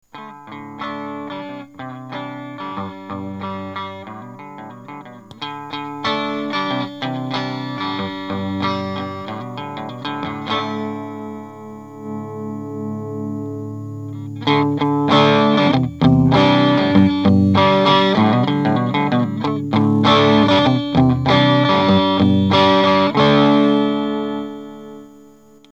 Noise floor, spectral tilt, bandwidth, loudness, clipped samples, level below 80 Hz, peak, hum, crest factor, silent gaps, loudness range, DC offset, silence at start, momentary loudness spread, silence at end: -46 dBFS; -7 dB/octave; 8 kHz; -16 LUFS; under 0.1%; -48 dBFS; 0 dBFS; 50 Hz at -50 dBFS; 18 dB; none; 15 LU; 0.2%; 0.15 s; 20 LU; 0.65 s